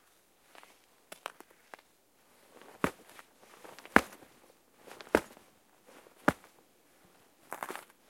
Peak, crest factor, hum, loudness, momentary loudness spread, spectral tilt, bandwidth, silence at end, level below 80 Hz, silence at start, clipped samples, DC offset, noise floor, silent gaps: -2 dBFS; 36 dB; none; -33 LUFS; 29 LU; -4.5 dB/octave; 16.5 kHz; 0.3 s; -64 dBFS; 2.85 s; under 0.1%; under 0.1%; -68 dBFS; none